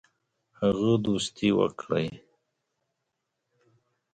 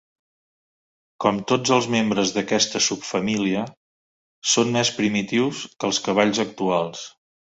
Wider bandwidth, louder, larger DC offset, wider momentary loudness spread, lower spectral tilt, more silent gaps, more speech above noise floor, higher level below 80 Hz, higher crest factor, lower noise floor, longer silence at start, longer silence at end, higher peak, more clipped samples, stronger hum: first, 9.4 kHz vs 8.4 kHz; second, -27 LUFS vs -22 LUFS; neither; second, 5 LU vs 8 LU; first, -6 dB/octave vs -3.5 dB/octave; second, none vs 3.77-4.42 s; second, 56 dB vs over 68 dB; about the same, -60 dBFS vs -62 dBFS; about the same, 20 dB vs 20 dB; second, -82 dBFS vs under -90 dBFS; second, 0.6 s vs 1.2 s; first, 1.95 s vs 0.5 s; second, -10 dBFS vs -2 dBFS; neither; neither